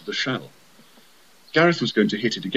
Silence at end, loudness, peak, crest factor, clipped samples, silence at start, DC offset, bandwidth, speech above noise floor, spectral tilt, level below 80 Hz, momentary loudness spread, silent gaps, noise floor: 0 s; -22 LUFS; -4 dBFS; 20 dB; under 0.1%; 0.05 s; 0.2%; 14.5 kHz; 33 dB; -5 dB/octave; -74 dBFS; 8 LU; none; -54 dBFS